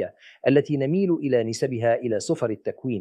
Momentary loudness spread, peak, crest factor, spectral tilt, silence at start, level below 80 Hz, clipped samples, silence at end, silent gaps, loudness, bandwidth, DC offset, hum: 7 LU; -6 dBFS; 18 dB; -6.5 dB/octave; 0 s; -70 dBFS; under 0.1%; 0 s; none; -24 LUFS; 12 kHz; under 0.1%; none